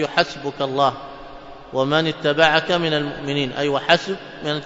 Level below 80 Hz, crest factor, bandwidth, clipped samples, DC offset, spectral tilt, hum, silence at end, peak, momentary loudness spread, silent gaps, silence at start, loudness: -52 dBFS; 20 dB; 7.8 kHz; under 0.1%; under 0.1%; -5 dB/octave; none; 0 s; 0 dBFS; 18 LU; none; 0 s; -20 LUFS